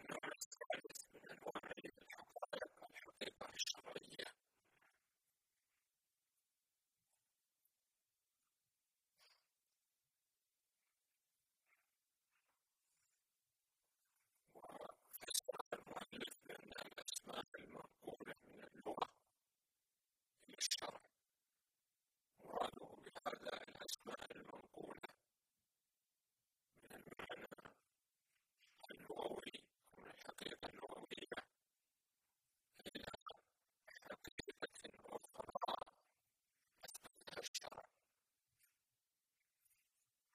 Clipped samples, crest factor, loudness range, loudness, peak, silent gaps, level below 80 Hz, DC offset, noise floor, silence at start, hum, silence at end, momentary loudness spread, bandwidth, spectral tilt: under 0.1%; 30 dB; 10 LU; -51 LUFS; -26 dBFS; 0.46-0.51 s, 0.66-0.70 s, 15.61-15.71 s, 17.48-17.52 s, 33.22-33.26 s, 34.32-34.38 s, 37.48-37.54 s; -84 dBFS; under 0.1%; under -90 dBFS; 0 s; none; 2.5 s; 14 LU; 15.5 kHz; -1.5 dB/octave